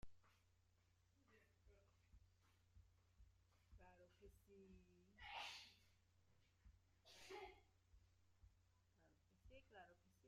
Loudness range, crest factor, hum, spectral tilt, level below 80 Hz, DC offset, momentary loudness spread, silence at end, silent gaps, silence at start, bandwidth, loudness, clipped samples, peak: 6 LU; 24 dB; none; -3 dB/octave; -78 dBFS; under 0.1%; 15 LU; 0 s; none; 0 s; 14.5 kHz; -60 LUFS; under 0.1%; -42 dBFS